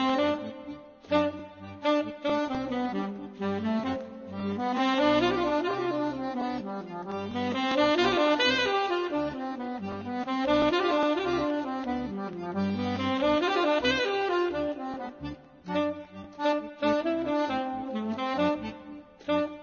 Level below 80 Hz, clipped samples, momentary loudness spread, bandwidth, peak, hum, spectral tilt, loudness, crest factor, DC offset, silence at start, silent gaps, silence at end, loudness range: -58 dBFS; under 0.1%; 13 LU; 7.2 kHz; -10 dBFS; none; -5.5 dB/octave; -28 LUFS; 18 dB; under 0.1%; 0 s; none; 0 s; 4 LU